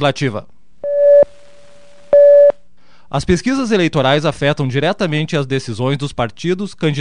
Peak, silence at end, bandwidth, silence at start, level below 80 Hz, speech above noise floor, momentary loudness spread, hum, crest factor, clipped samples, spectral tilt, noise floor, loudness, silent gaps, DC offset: 0 dBFS; 0 s; 10 kHz; 0 s; -40 dBFS; 36 dB; 12 LU; none; 14 dB; under 0.1%; -6 dB/octave; -53 dBFS; -14 LUFS; none; 2%